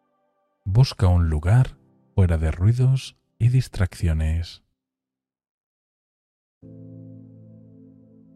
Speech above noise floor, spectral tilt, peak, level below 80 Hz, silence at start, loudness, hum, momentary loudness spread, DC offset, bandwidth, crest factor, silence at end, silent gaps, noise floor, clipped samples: 69 dB; -7.5 dB/octave; -6 dBFS; -34 dBFS; 0.65 s; -22 LUFS; none; 19 LU; under 0.1%; 11.5 kHz; 18 dB; 1.2 s; 5.49-6.61 s; -89 dBFS; under 0.1%